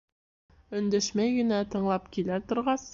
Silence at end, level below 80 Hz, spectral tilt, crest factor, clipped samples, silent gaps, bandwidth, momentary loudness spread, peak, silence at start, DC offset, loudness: 0 s; -58 dBFS; -5 dB/octave; 14 dB; under 0.1%; none; 7.6 kHz; 5 LU; -16 dBFS; 0.7 s; under 0.1%; -29 LUFS